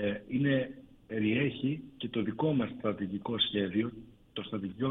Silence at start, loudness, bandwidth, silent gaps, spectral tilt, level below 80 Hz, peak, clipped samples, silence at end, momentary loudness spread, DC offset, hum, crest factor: 0 s; -33 LUFS; 4.1 kHz; none; -9 dB/octave; -64 dBFS; -16 dBFS; under 0.1%; 0 s; 11 LU; under 0.1%; none; 16 dB